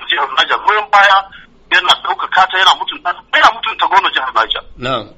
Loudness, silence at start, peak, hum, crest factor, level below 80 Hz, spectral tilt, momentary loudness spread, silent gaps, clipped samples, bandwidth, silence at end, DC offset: -12 LUFS; 0 s; 0 dBFS; none; 14 dB; -46 dBFS; -1.5 dB/octave; 9 LU; none; 0.2%; 15.5 kHz; 0.1 s; under 0.1%